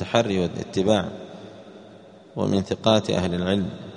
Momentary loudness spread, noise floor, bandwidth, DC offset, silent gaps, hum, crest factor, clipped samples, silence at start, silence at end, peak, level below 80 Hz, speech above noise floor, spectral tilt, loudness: 21 LU; -47 dBFS; 10 kHz; under 0.1%; none; none; 22 dB; under 0.1%; 0 s; 0 s; -2 dBFS; -54 dBFS; 24 dB; -6 dB/octave; -23 LUFS